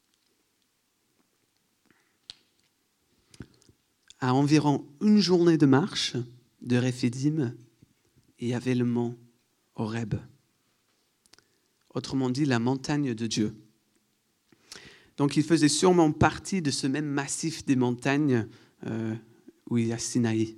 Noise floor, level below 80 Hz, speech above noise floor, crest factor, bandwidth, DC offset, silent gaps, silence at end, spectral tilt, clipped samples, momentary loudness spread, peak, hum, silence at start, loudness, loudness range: -73 dBFS; -62 dBFS; 47 dB; 22 dB; 13 kHz; under 0.1%; none; 0 s; -5.5 dB/octave; under 0.1%; 19 LU; -6 dBFS; none; 3.4 s; -26 LUFS; 8 LU